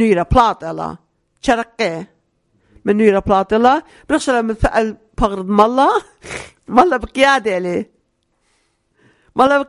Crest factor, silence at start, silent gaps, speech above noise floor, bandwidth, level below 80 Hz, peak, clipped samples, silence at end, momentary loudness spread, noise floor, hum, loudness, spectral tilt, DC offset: 16 dB; 0 s; none; 50 dB; 11.5 kHz; -34 dBFS; 0 dBFS; 0.1%; 0.05 s; 13 LU; -65 dBFS; none; -16 LUFS; -5.5 dB/octave; under 0.1%